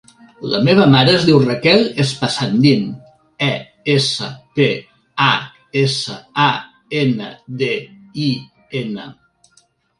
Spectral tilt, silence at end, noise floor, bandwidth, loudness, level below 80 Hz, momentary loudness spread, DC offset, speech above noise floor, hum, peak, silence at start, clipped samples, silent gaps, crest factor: -5.5 dB/octave; 0.85 s; -57 dBFS; 11.5 kHz; -16 LUFS; -54 dBFS; 15 LU; under 0.1%; 42 dB; none; 0 dBFS; 0.4 s; under 0.1%; none; 16 dB